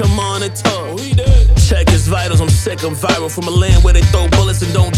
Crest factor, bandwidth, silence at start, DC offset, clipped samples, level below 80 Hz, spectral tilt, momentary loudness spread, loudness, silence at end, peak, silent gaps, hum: 10 dB; 15 kHz; 0 s; under 0.1%; under 0.1%; -16 dBFS; -5 dB/octave; 6 LU; -13 LUFS; 0 s; 0 dBFS; none; none